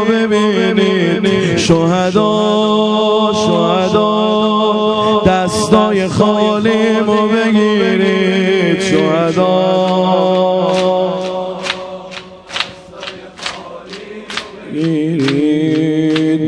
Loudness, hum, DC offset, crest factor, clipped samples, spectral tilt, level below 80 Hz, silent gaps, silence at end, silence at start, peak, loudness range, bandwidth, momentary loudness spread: -13 LUFS; none; under 0.1%; 12 dB; under 0.1%; -5.5 dB/octave; -46 dBFS; none; 0 s; 0 s; 0 dBFS; 9 LU; 11 kHz; 12 LU